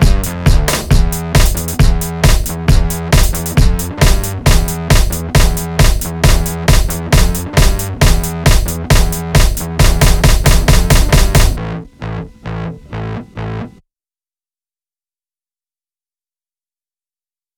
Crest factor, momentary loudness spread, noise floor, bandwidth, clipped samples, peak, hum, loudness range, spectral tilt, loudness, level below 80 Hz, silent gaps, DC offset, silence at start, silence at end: 12 dB; 13 LU; under -90 dBFS; over 20 kHz; under 0.1%; 0 dBFS; none; 15 LU; -4.5 dB/octave; -13 LUFS; -14 dBFS; none; under 0.1%; 0 s; 3.9 s